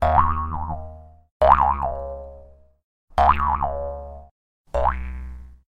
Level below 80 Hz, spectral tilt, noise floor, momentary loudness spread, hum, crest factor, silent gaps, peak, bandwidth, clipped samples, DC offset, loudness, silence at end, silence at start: -32 dBFS; -7.5 dB/octave; -47 dBFS; 20 LU; none; 22 dB; 1.31-1.40 s, 2.84-3.08 s, 4.31-4.65 s; 0 dBFS; 8.6 kHz; under 0.1%; under 0.1%; -22 LUFS; 0.15 s; 0 s